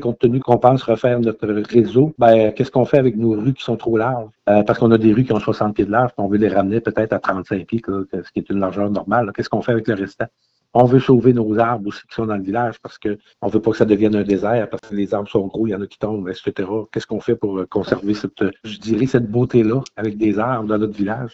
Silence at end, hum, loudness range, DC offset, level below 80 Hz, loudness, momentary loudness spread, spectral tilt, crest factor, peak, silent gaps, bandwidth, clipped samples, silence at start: 0.05 s; none; 6 LU; under 0.1%; -50 dBFS; -18 LUFS; 11 LU; -8.5 dB/octave; 18 dB; 0 dBFS; none; 7.8 kHz; under 0.1%; 0 s